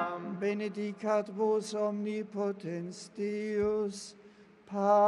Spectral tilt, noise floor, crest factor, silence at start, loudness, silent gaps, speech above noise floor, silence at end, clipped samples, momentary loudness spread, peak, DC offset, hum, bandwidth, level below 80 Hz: -6 dB/octave; -57 dBFS; 18 dB; 0 s; -34 LUFS; none; 25 dB; 0 s; under 0.1%; 9 LU; -14 dBFS; under 0.1%; none; 11.5 kHz; -70 dBFS